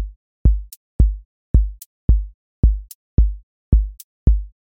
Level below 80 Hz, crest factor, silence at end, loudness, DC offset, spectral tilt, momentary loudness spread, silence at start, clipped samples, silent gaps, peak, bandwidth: -18 dBFS; 16 dB; 0.2 s; -21 LUFS; under 0.1%; -9 dB/octave; 13 LU; 0 s; under 0.1%; 0.16-0.45 s, 0.77-0.99 s, 1.25-1.54 s, 1.86-2.08 s, 2.34-2.63 s, 2.95-3.17 s, 3.43-3.72 s, 4.04-4.26 s; -2 dBFS; 16 kHz